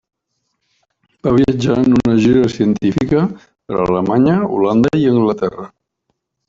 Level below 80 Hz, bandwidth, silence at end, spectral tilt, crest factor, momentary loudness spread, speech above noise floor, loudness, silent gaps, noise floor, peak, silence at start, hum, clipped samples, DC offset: -42 dBFS; 7.6 kHz; 0.8 s; -8 dB/octave; 14 dB; 10 LU; 58 dB; -14 LUFS; none; -71 dBFS; -2 dBFS; 1.25 s; none; under 0.1%; under 0.1%